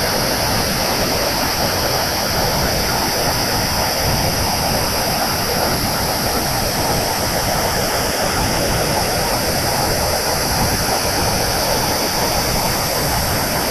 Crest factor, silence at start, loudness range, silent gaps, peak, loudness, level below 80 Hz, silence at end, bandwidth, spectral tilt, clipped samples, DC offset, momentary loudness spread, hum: 14 dB; 0 s; 1 LU; none; -4 dBFS; -17 LUFS; -30 dBFS; 0 s; 13.5 kHz; -3 dB/octave; under 0.1%; under 0.1%; 1 LU; none